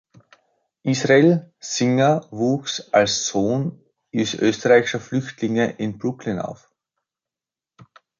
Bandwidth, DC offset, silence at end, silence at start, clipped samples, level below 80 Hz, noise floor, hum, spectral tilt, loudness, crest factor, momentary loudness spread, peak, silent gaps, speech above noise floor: 7.6 kHz; under 0.1%; 1.65 s; 0.85 s; under 0.1%; -60 dBFS; -90 dBFS; none; -5 dB/octave; -20 LUFS; 18 dB; 12 LU; -2 dBFS; none; 70 dB